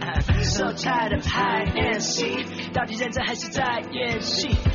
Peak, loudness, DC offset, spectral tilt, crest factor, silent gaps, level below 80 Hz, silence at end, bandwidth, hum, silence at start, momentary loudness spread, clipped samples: -10 dBFS; -24 LUFS; under 0.1%; -3.5 dB/octave; 14 dB; none; -32 dBFS; 0 s; 7.4 kHz; none; 0 s; 4 LU; under 0.1%